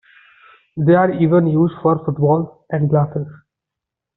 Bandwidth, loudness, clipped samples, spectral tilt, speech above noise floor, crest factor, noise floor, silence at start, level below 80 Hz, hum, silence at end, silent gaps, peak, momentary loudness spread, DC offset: 4.1 kHz; -17 LUFS; under 0.1%; -9 dB/octave; 68 dB; 14 dB; -84 dBFS; 0.75 s; -56 dBFS; none; 0.85 s; none; -2 dBFS; 11 LU; under 0.1%